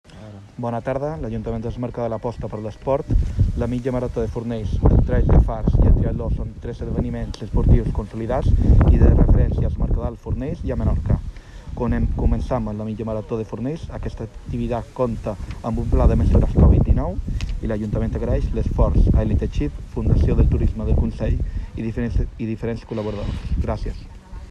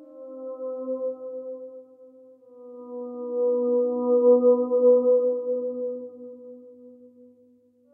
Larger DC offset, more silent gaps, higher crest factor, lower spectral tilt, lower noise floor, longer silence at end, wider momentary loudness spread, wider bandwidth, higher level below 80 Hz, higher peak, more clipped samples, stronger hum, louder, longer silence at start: neither; neither; about the same, 16 dB vs 16 dB; second, -9.5 dB/octave vs -12.5 dB/octave; second, -39 dBFS vs -59 dBFS; second, 0 s vs 1 s; second, 12 LU vs 24 LU; first, 7.2 kHz vs 1.4 kHz; first, -22 dBFS vs under -90 dBFS; first, -4 dBFS vs -8 dBFS; neither; neither; about the same, -22 LUFS vs -23 LUFS; about the same, 0.1 s vs 0 s